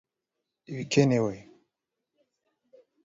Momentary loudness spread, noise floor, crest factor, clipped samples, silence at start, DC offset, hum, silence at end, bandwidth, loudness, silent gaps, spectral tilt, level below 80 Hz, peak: 18 LU; -85 dBFS; 24 dB; under 0.1%; 0.7 s; under 0.1%; none; 1.6 s; 7.8 kHz; -26 LUFS; none; -6 dB/octave; -66 dBFS; -8 dBFS